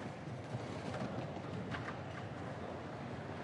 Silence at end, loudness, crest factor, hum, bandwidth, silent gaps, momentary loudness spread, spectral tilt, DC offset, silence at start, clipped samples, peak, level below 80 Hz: 0 s; -44 LUFS; 16 dB; none; 11.5 kHz; none; 3 LU; -6.5 dB/octave; under 0.1%; 0 s; under 0.1%; -28 dBFS; -68 dBFS